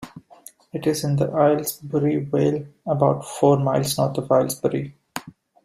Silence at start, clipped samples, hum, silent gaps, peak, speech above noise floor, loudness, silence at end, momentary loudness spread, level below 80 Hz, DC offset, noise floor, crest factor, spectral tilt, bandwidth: 0 s; under 0.1%; none; none; -4 dBFS; 27 dB; -21 LUFS; 0.35 s; 15 LU; -58 dBFS; under 0.1%; -48 dBFS; 18 dB; -6 dB/octave; 15.5 kHz